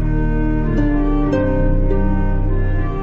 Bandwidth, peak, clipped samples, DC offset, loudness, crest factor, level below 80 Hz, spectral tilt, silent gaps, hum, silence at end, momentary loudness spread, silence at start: 3.3 kHz; -4 dBFS; under 0.1%; under 0.1%; -19 LUFS; 12 dB; -18 dBFS; -10 dB/octave; none; none; 0 s; 3 LU; 0 s